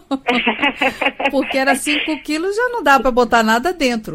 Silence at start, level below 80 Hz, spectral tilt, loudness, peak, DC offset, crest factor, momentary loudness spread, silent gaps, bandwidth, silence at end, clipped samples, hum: 0.1 s; -42 dBFS; -3 dB/octave; -16 LUFS; -2 dBFS; under 0.1%; 16 dB; 5 LU; none; 16.5 kHz; 0 s; under 0.1%; none